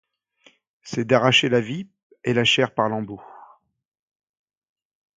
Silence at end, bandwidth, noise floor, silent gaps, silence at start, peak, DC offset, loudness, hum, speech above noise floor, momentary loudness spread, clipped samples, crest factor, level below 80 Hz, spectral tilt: 1.75 s; 9.4 kHz; -59 dBFS; 2.03-2.10 s; 0.85 s; 0 dBFS; under 0.1%; -20 LUFS; none; 38 dB; 18 LU; under 0.1%; 24 dB; -62 dBFS; -4.5 dB/octave